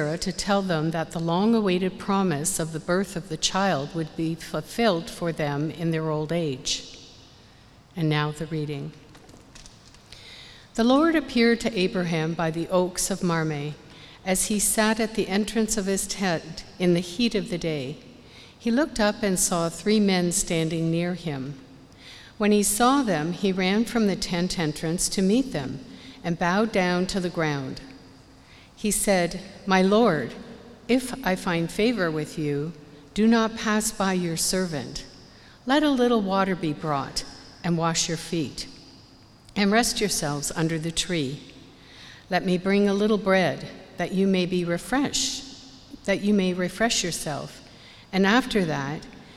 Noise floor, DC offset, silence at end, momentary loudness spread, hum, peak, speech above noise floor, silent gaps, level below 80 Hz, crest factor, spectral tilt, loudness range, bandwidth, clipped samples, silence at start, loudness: -52 dBFS; under 0.1%; 0 s; 15 LU; none; -4 dBFS; 28 dB; none; -50 dBFS; 20 dB; -4.5 dB/octave; 4 LU; 15.5 kHz; under 0.1%; 0 s; -24 LUFS